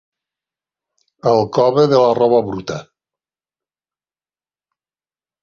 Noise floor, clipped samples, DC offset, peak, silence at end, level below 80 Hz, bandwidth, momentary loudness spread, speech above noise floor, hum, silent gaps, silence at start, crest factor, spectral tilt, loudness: under -90 dBFS; under 0.1%; under 0.1%; -2 dBFS; 2.6 s; -56 dBFS; 7.2 kHz; 14 LU; over 76 dB; none; none; 1.25 s; 18 dB; -7 dB/octave; -15 LUFS